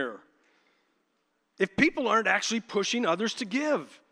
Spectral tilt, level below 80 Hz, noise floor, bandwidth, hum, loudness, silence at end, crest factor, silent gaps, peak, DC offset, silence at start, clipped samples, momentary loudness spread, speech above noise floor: -3.5 dB/octave; -68 dBFS; -75 dBFS; 11.5 kHz; none; -27 LUFS; 0.15 s; 22 dB; none; -8 dBFS; under 0.1%; 0 s; under 0.1%; 7 LU; 47 dB